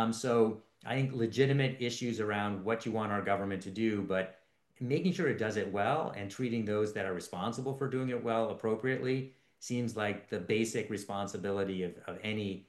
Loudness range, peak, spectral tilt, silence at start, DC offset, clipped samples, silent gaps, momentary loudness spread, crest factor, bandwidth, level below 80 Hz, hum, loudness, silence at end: 2 LU; -14 dBFS; -6 dB/octave; 0 s; under 0.1%; under 0.1%; none; 8 LU; 20 dB; 12.5 kHz; -76 dBFS; none; -34 LUFS; 0.05 s